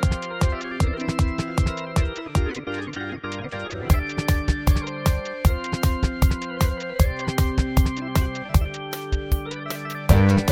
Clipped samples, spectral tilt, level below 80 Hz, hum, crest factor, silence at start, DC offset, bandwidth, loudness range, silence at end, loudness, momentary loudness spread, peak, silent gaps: under 0.1%; -6 dB/octave; -26 dBFS; none; 20 dB; 0 s; under 0.1%; 17.5 kHz; 3 LU; 0 s; -24 LUFS; 8 LU; -2 dBFS; none